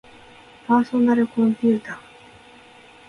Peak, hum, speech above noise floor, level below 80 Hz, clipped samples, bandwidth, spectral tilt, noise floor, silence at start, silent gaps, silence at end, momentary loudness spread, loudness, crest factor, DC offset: -6 dBFS; none; 29 dB; -62 dBFS; under 0.1%; 6.6 kHz; -7.5 dB/octave; -48 dBFS; 0.7 s; none; 1.1 s; 19 LU; -20 LUFS; 18 dB; under 0.1%